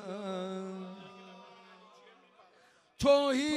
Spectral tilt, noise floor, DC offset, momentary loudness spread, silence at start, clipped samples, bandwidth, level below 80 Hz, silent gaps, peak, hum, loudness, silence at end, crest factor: -4.5 dB/octave; -65 dBFS; under 0.1%; 26 LU; 0 s; under 0.1%; 15 kHz; -60 dBFS; none; -14 dBFS; none; -31 LUFS; 0 s; 20 dB